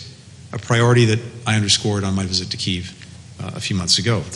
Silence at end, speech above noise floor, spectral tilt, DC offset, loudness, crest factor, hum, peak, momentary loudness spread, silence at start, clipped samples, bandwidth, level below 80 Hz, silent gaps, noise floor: 0 s; 21 dB; -4 dB/octave; under 0.1%; -18 LUFS; 16 dB; none; -4 dBFS; 18 LU; 0 s; under 0.1%; 11.5 kHz; -50 dBFS; none; -40 dBFS